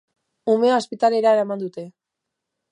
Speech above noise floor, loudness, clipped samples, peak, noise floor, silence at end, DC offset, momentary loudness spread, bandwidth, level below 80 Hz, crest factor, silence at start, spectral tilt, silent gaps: 63 dB; -20 LUFS; under 0.1%; -6 dBFS; -82 dBFS; 0.8 s; under 0.1%; 16 LU; 10.5 kHz; -78 dBFS; 16 dB; 0.45 s; -5.5 dB/octave; none